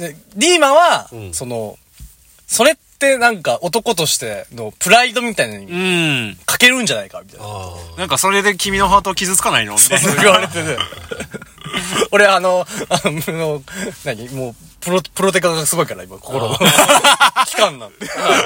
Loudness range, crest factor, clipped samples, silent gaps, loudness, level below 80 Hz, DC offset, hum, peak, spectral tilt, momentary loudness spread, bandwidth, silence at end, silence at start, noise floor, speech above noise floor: 5 LU; 16 dB; under 0.1%; none; -14 LUFS; -46 dBFS; under 0.1%; none; 0 dBFS; -2.5 dB/octave; 18 LU; over 20 kHz; 0 s; 0 s; -41 dBFS; 26 dB